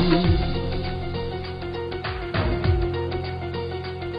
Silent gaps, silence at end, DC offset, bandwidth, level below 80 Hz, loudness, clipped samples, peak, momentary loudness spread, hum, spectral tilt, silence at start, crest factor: none; 0 s; under 0.1%; 5.4 kHz; -32 dBFS; -26 LUFS; under 0.1%; -6 dBFS; 9 LU; none; -9 dB/octave; 0 s; 18 dB